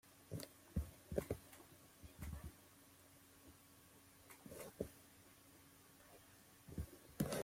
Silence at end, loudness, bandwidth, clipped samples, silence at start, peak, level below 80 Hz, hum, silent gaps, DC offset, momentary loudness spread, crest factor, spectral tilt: 0 s; -52 LUFS; 16.5 kHz; under 0.1%; 0.05 s; -24 dBFS; -62 dBFS; none; none; under 0.1%; 18 LU; 28 dB; -5.5 dB/octave